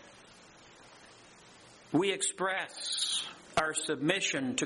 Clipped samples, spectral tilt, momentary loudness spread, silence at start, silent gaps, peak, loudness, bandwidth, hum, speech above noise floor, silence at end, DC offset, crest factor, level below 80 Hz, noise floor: under 0.1%; -2.5 dB/octave; 5 LU; 0 s; none; -14 dBFS; -31 LUFS; 11.5 kHz; none; 24 dB; 0 s; under 0.1%; 20 dB; -68 dBFS; -56 dBFS